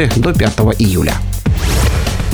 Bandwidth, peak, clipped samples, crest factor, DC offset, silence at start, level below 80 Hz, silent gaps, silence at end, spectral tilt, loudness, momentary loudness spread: over 20 kHz; 0 dBFS; under 0.1%; 12 dB; under 0.1%; 0 s; -18 dBFS; none; 0 s; -5.5 dB/octave; -14 LUFS; 4 LU